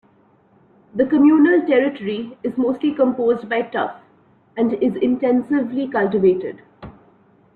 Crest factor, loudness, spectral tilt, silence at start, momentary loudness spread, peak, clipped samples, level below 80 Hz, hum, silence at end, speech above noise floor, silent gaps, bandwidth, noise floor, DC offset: 14 dB; -18 LUFS; -9 dB/octave; 0.95 s; 12 LU; -6 dBFS; under 0.1%; -58 dBFS; none; 0.65 s; 38 dB; none; 4.4 kHz; -55 dBFS; under 0.1%